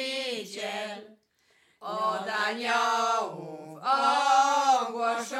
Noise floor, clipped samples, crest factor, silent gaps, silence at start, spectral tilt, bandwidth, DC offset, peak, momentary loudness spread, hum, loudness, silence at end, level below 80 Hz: -67 dBFS; under 0.1%; 16 dB; none; 0 s; -2 dB/octave; 14.5 kHz; under 0.1%; -12 dBFS; 16 LU; none; -27 LUFS; 0 s; under -90 dBFS